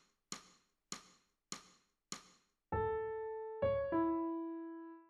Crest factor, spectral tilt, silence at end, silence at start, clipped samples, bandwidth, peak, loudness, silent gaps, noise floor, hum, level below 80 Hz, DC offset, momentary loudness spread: 16 dB; -5 dB/octave; 0.05 s; 0.3 s; under 0.1%; 13.5 kHz; -26 dBFS; -42 LUFS; none; -70 dBFS; none; -62 dBFS; under 0.1%; 15 LU